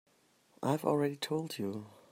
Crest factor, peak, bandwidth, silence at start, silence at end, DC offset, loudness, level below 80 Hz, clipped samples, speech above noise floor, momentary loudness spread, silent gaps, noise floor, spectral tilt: 20 dB; -16 dBFS; 16 kHz; 0.6 s; 0.15 s; under 0.1%; -35 LUFS; -80 dBFS; under 0.1%; 35 dB; 9 LU; none; -69 dBFS; -6 dB/octave